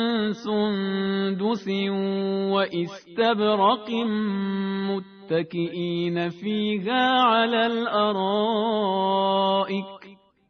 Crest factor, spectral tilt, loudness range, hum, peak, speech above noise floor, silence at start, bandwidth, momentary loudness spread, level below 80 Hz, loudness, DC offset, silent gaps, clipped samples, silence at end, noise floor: 16 dB; -3.5 dB/octave; 3 LU; none; -8 dBFS; 26 dB; 0 s; 6.6 kHz; 8 LU; -68 dBFS; -24 LUFS; under 0.1%; none; under 0.1%; 0.35 s; -50 dBFS